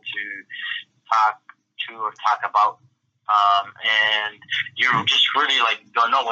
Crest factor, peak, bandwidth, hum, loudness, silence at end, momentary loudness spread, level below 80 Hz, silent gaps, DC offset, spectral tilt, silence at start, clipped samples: 16 dB; -6 dBFS; 8 kHz; none; -20 LUFS; 0 s; 14 LU; -80 dBFS; none; under 0.1%; -1.5 dB/octave; 0.05 s; under 0.1%